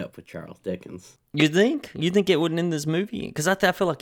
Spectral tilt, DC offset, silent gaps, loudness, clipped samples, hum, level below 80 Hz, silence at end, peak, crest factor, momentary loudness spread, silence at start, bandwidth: -5 dB/octave; under 0.1%; none; -23 LUFS; under 0.1%; none; -60 dBFS; 0.05 s; -4 dBFS; 20 dB; 17 LU; 0 s; 19 kHz